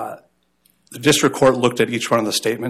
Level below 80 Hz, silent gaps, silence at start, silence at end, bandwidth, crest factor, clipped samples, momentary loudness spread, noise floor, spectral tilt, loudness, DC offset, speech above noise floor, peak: -56 dBFS; none; 0 s; 0 s; 15 kHz; 16 dB; under 0.1%; 5 LU; -62 dBFS; -4 dB/octave; -17 LUFS; under 0.1%; 44 dB; -4 dBFS